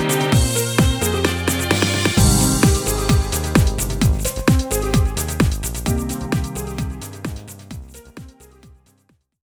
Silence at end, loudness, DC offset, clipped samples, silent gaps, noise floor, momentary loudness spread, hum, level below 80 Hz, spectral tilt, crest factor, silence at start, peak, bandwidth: 1.1 s; -18 LUFS; under 0.1%; under 0.1%; none; -61 dBFS; 16 LU; none; -26 dBFS; -4.5 dB/octave; 18 dB; 0 s; 0 dBFS; over 20 kHz